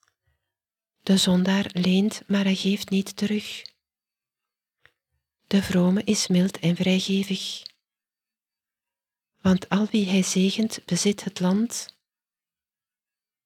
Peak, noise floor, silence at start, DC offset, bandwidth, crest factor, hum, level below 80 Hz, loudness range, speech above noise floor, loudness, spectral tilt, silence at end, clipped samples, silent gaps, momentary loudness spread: -8 dBFS; under -90 dBFS; 1.05 s; under 0.1%; 15 kHz; 18 dB; none; -60 dBFS; 4 LU; over 67 dB; -23 LUFS; -5 dB/octave; 1.6 s; under 0.1%; none; 8 LU